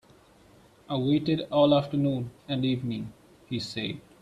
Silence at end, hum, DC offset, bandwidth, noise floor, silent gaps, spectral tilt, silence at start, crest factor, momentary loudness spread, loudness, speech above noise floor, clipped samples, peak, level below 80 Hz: 0.2 s; none; under 0.1%; 11.5 kHz; -57 dBFS; none; -7.5 dB/octave; 0.9 s; 18 dB; 13 LU; -28 LUFS; 30 dB; under 0.1%; -10 dBFS; -62 dBFS